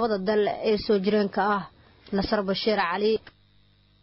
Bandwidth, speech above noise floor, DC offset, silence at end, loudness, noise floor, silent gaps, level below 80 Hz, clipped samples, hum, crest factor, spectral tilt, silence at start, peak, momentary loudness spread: 5.8 kHz; 36 dB; under 0.1%; 0.75 s; -25 LUFS; -60 dBFS; none; -52 dBFS; under 0.1%; 50 Hz at -50 dBFS; 14 dB; -9.5 dB/octave; 0 s; -12 dBFS; 6 LU